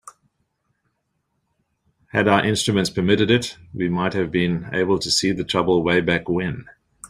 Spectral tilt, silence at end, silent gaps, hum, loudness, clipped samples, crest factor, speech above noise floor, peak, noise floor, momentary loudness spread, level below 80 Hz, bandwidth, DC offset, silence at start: -4.5 dB/octave; 0.05 s; none; none; -20 LUFS; under 0.1%; 20 dB; 53 dB; -2 dBFS; -73 dBFS; 7 LU; -52 dBFS; 15 kHz; under 0.1%; 0.05 s